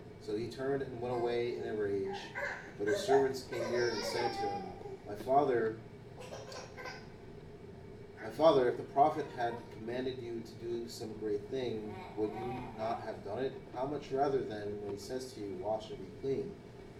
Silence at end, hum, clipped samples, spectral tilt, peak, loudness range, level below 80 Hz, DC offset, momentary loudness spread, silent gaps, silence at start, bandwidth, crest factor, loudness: 0 s; none; under 0.1%; -5.5 dB/octave; -16 dBFS; 6 LU; -62 dBFS; under 0.1%; 17 LU; none; 0 s; 15 kHz; 20 dB; -36 LUFS